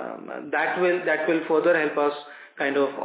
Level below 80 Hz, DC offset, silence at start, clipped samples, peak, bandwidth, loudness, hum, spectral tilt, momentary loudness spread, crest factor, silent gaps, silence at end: -86 dBFS; under 0.1%; 0 s; under 0.1%; -10 dBFS; 4 kHz; -23 LUFS; none; -9 dB/octave; 14 LU; 16 dB; none; 0 s